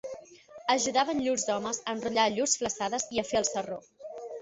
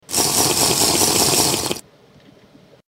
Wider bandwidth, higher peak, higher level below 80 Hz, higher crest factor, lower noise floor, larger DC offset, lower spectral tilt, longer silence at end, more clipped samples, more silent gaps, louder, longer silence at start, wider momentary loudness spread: second, 8.4 kHz vs 16.5 kHz; second, -10 dBFS vs 0 dBFS; second, -64 dBFS vs -46 dBFS; about the same, 20 dB vs 20 dB; about the same, -50 dBFS vs -49 dBFS; neither; about the same, -2 dB/octave vs -1.5 dB/octave; second, 0 s vs 1.1 s; neither; neither; second, -29 LUFS vs -15 LUFS; about the same, 0.05 s vs 0.1 s; first, 16 LU vs 9 LU